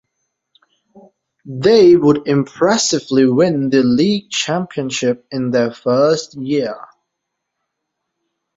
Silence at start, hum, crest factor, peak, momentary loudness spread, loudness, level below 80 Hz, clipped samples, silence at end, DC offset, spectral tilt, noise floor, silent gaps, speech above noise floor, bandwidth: 1.45 s; none; 16 dB; -2 dBFS; 10 LU; -15 LUFS; -56 dBFS; under 0.1%; 1.7 s; under 0.1%; -5 dB/octave; -77 dBFS; none; 62 dB; 8 kHz